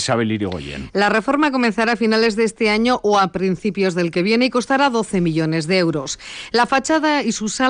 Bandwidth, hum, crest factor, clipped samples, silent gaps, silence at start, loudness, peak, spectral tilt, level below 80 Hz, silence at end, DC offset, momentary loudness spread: 10 kHz; none; 12 dB; under 0.1%; none; 0 s; -18 LUFS; -6 dBFS; -4.5 dB/octave; -48 dBFS; 0 s; under 0.1%; 5 LU